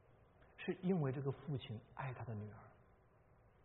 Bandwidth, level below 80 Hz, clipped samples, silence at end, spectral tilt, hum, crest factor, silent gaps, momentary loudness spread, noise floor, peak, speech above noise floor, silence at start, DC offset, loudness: 3.9 kHz; -72 dBFS; under 0.1%; 0.8 s; -7 dB/octave; none; 18 dB; none; 12 LU; -70 dBFS; -26 dBFS; 27 dB; 0.1 s; under 0.1%; -44 LUFS